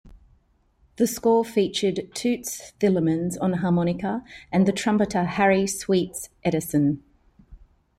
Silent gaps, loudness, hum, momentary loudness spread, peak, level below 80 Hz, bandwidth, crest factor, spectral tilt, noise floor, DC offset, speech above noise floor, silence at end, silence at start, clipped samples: none; -24 LUFS; none; 8 LU; -8 dBFS; -54 dBFS; 15.5 kHz; 16 dB; -5.5 dB/octave; -62 dBFS; under 0.1%; 40 dB; 0.4 s; 0.05 s; under 0.1%